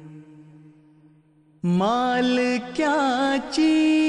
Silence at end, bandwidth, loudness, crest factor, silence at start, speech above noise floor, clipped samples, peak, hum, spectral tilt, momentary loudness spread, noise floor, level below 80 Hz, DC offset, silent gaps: 0 s; 10.5 kHz; -22 LUFS; 12 dB; 0 s; 36 dB; under 0.1%; -10 dBFS; none; -5.5 dB/octave; 5 LU; -57 dBFS; -60 dBFS; under 0.1%; none